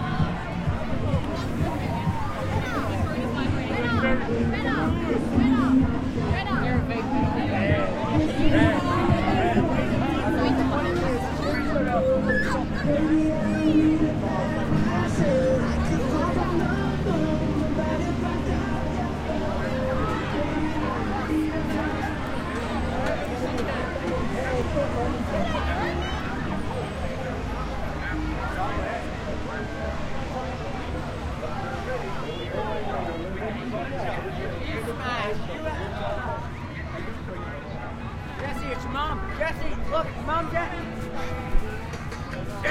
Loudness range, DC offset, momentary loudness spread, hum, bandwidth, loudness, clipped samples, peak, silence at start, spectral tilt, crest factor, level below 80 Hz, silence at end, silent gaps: 8 LU; under 0.1%; 9 LU; none; 15 kHz; -26 LUFS; under 0.1%; -8 dBFS; 0 s; -7 dB/octave; 18 dB; -36 dBFS; 0 s; none